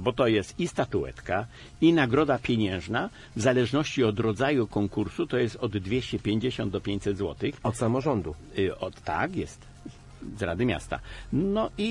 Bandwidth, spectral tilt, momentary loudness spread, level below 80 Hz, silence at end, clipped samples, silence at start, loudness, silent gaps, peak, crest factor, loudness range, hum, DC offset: 11.5 kHz; -6 dB/octave; 11 LU; -50 dBFS; 0 s; under 0.1%; 0 s; -28 LUFS; none; -10 dBFS; 18 dB; 5 LU; none; under 0.1%